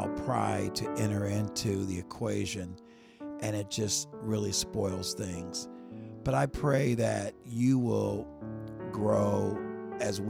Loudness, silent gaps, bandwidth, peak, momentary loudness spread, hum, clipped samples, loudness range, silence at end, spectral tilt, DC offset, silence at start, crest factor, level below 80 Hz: -32 LUFS; none; 16.5 kHz; -14 dBFS; 13 LU; none; under 0.1%; 4 LU; 0 s; -5 dB/octave; under 0.1%; 0 s; 18 dB; -54 dBFS